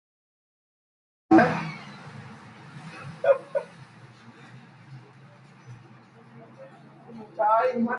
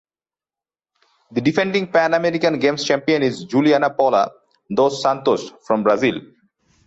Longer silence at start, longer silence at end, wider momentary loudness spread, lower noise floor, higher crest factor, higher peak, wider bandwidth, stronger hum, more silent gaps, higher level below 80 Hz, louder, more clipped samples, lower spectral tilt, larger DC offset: about the same, 1.3 s vs 1.3 s; second, 0 s vs 0.6 s; first, 28 LU vs 6 LU; second, -51 dBFS vs under -90 dBFS; first, 24 dB vs 16 dB; about the same, -6 dBFS vs -4 dBFS; first, 10.5 kHz vs 8.2 kHz; neither; neither; second, -68 dBFS vs -62 dBFS; second, -23 LUFS vs -18 LUFS; neither; first, -7.5 dB/octave vs -5.5 dB/octave; neither